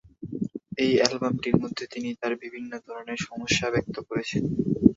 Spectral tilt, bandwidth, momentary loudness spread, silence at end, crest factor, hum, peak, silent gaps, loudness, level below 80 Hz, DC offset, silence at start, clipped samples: -5 dB/octave; 7.8 kHz; 14 LU; 0 s; 24 dB; none; -2 dBFS; none; -27 LUFS; -52 dBFS; under 0.1%; 0.2 s; under 0.1%